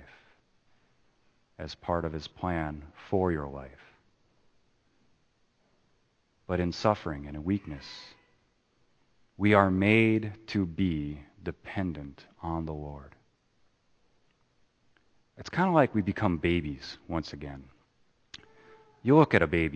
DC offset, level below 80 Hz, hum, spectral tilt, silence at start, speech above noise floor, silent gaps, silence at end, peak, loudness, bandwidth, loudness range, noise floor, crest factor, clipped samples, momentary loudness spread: under 0.1%; -52 dBFS; none; -7.5 dB/octave; 0 s; 42 dB; none; 0 s; -6 dBFS; -29 LUFS; 8.8 kHz; 12 LU; -71 dBFS; 26 dB; under 0.1%; 22 LU